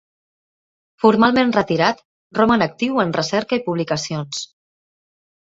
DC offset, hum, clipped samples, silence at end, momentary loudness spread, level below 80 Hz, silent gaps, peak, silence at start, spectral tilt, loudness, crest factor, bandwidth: under 0.1%; none; under 0.1%; 0.95 s; 13 LU; -56 dBFS; 2.05-2.30 s; -2 dBFS; 1.05 s; -5 dB/octave; -18 LUFS; 18 dB; 8 kHz